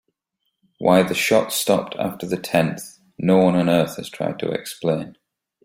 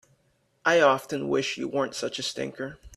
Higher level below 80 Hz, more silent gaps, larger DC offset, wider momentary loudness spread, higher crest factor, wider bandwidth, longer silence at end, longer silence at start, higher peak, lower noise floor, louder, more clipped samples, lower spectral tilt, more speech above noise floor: about the same, -58 dBFS vs -60 dBFS; neither; neither; about the same, 11 LU vs 12 LU; about the same, 18 dB vs 20 dB; first, 16.5 kHz vs 14 kHz; first, 0.55 s vs 0.1 s; first, 0.8 s vs 0.65 s; first, -2 dBFS vs -6 dBFS; first, -76 dBFS vs -69 dBFS; first, -20 LUFS vs -26 LUFS; neither; first, -5 dB/octave vs -3.5 dB/octave; first, 56 dB vs 43 dB